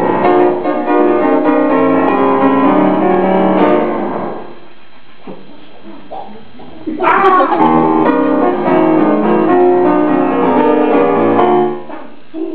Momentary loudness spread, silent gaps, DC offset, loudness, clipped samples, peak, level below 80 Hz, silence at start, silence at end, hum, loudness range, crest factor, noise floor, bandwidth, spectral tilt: 15 LU; none; 5%; -11 LUFS; under 0.1%; 0 dBFS; -50 dBFS; 0 s; 0 s; none; 7 LU; 12 dB; -42 dBFS; 4 kHz; -11 dB/octave